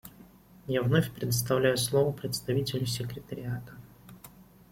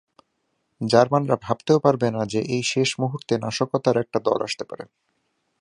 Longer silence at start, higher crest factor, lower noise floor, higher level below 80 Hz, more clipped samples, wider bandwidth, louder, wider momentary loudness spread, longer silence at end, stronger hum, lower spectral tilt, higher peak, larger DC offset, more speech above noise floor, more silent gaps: second, 0.05 s vs 0.8 s; about the same, 20 dB vs 22 dB; second, -54 dBFS vs -73 dBFS; about the same, -58 dBFS vs -62 dBFS; neither; first, 16.5 kHz vs 11 kHz; second, -29 LUFS vs -22 LUFS; first, 24 LU vs 12 LU; second, 0.3 s vs 0.75 s; neither; about the same, -5 dB/octave vs -5.5 dB/octave; second, -10 dBFS vs -2 dBFS; neither; second, 25 dB vs 51 dB; neither